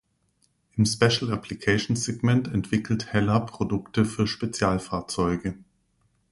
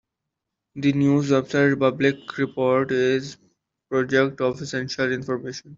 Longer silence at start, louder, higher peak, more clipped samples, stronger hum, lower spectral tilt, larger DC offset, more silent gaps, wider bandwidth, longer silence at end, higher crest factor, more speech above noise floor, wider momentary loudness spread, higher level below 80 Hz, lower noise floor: about the same, 0.75 s vs 0.75 s; second, -25 LUFS vs -22 LUFS; about the same, -6 dBFS vs -4 dBFS; neither; neither; about the same, -5.5 dB/octave vs -6 dB/octave; neither; neither; first, 11.5 kHz vs 7.6 kHz; first, 0.75 s vs 0 s; about the same, 20 dB vs 18 dB; second, 44 dB vs 61 dB; about the same, 8 LU vs 9 LU; first, -48 dBFS vs -62 dBFS; second, -69 dBFS vs -83 dBFS